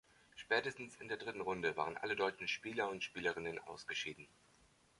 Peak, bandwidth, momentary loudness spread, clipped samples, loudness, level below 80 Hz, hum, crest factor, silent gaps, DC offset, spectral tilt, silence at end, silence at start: -20 dBFS; 11.5 kHz; 12 LU; under 0.1%; -41 LUFS; -74 dBFS; none; 22 dB; none; under 0.1%; -3.5 dB/octave; 0.75 s; 0.35 s